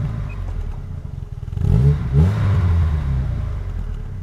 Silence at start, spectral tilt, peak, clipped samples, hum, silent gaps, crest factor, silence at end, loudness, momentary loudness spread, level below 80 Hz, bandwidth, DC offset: 0 s; -9 dB/octave; -2 dBFS; under 0.1%; none; none; 16 dB; 0 s; -20 LUFS; 15 LU; -24 dBFS; 7.2 kHz; under 0.1%